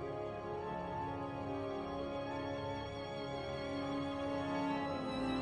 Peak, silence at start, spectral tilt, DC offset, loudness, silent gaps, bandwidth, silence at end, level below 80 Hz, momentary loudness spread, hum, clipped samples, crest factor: -26 dBFS; 0 s; -6.5 dB/octave; under 0.1%; -41 LUFS; none; 10.5 kHz; 0 s; -60 dBFS; 5 LU; none; under 0.1%; 14 dB